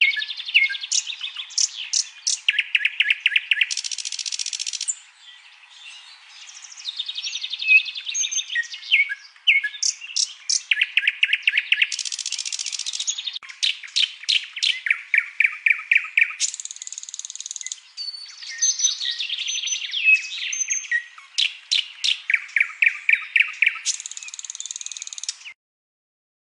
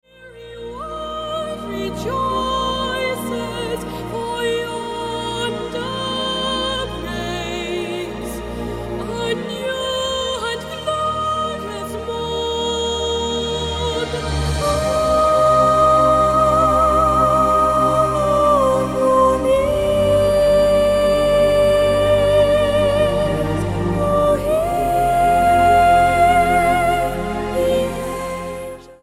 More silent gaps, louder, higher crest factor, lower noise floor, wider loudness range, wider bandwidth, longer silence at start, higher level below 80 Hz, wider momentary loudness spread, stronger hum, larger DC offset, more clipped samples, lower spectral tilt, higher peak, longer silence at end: neither; second, -21 LUFS vs -18 LUFS; first, 20 dB vs 14 dB; first, -47 dBFS vs -39 dBFS; second, 5 LU vs 9 LU; second, 10.5 kHz vs 16 kHz; second, 0 s vs 0.2 s; second, -86 dBFS vs -34 dBFS; about the same, 14 LU vs 12 LU; neither; neither; neither; second, 8.5 dB/octave vs -5 dB/octave; about the same, -6 dBFS vs -4 dBFS; first, 1 s vs 0.1 s